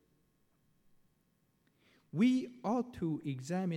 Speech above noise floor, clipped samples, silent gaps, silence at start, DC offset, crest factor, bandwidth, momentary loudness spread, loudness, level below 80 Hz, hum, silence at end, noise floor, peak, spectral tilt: 41 dB; under 0.1%; none; 2.15 s; under 0.1%; 18 dB; 11 kHz; 8 LU; -35 LUFS; -72 dBFS; none; 0 s; -75 dBFS; -20 dBFS; -7 dB/octave